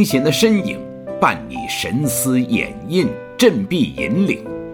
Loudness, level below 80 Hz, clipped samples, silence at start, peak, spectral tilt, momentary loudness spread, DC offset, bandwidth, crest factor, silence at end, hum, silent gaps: -18 LUFS; -46 dBFS; under 0.1%; 0 s; 0 dBFS; -5 dB/octave; 9 LU; under 0.1%; 19 kHz; 18 dB; 0 s; none; none